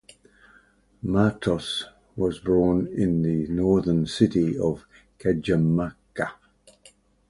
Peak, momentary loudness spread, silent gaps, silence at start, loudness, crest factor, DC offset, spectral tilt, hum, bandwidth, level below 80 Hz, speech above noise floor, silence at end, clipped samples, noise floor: -6 dBFS; 10 LU; none; 1.05 s; -24 LUFS; 20 dB; under 0.1%; -7 dB/octave; none; 11.5 kHz; -46 dBFS; 36 dB; 0.95 s; under 0.1%; -59 dBFS